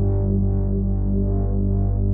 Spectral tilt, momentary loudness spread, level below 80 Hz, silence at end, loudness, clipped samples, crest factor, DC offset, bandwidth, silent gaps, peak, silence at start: -16.5 dB/octave; 2 LU; -24 dBFS; 0 s; -22 LUFS; under 0.1%; 8 dB; under 0.1%; 1.6 kHz; none; -10 dBFS; 0 s